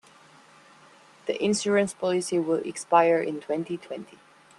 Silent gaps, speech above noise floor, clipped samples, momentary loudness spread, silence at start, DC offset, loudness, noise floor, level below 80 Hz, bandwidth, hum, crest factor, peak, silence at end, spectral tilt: none; 29 dB; under 0.1%; 14 LU; 1.25 s; under 0.1%; -25 LUFS; -54 dBFS; -72 dBFS; 12.5 kHz; none; 22 dB; -6 dBFS; 0.55 s; -4.5 dB/octave